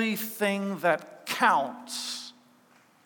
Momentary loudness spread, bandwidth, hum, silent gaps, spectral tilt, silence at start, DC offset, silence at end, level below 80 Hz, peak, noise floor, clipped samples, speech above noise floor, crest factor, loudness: 11 LU; 19.5 kHz; none; none; -3.5 dB/octave; 0 s; under 0.1%; 0.75 s; under -90 dBFS; -8 dBFS; -61 dBFS; under 0.1%; 33 dB; 20 dB; -28 LUFS